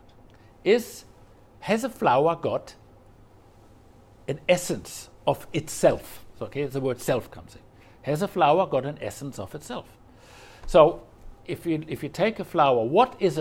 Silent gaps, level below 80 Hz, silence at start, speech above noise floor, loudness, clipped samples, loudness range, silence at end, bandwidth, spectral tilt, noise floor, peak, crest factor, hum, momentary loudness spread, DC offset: none; -50 dBFS; 0.65 s; 28 dB; -25 LUFS; under 0.1%; 4 LU; 0 s; 16.5 kHz; -5.5 dB/octave; -53 dBFS; -2 dBFS; 24 dB; none; 18 LU; under 0.1%